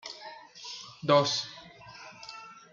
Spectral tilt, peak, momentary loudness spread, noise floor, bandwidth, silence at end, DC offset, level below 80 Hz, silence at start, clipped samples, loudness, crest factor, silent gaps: -4 dB/octave; -10 dBFS; 23 LU; -49 dBFS; 7.4 kHz; 0.15 s; under 0.1%; -74 dBFS; 0.05 s; under 0.1%; -28 LUFS; 22 dB; none